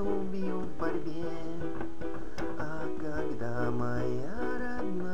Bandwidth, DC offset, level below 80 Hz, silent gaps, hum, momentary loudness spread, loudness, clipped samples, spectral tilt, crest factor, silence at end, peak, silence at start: 13.5 kHz; 4%; -50 dBFS; none; none; 6 LU; -36 LUFS; under 0.1%; -7.5 dB/octave; 16 dB; 0 s; -16 dBFS; 0 s